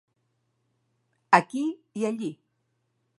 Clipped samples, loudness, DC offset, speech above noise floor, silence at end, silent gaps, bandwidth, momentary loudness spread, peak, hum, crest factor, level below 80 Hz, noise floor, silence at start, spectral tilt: under 0.1%; -26 LUFS; under 0.1%; 48 dB; 0.85 s; none; 11.5 kHz; 12 LU; -2 dBFS; none; 28 dB; -78 dBFS; -75 dBFS; 1.3 s; -5.5 dB/octave